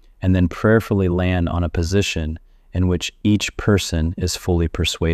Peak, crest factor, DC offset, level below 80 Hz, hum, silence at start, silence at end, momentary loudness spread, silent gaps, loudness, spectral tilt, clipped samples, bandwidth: -4 dBFS; 14 dB; under 0.1%; -32 dBFS; none; 0.2 s; 0 s; 6 LU; none; -20 LUFS; -5.5 dB/octave; under 0.1%; 13.5 kHz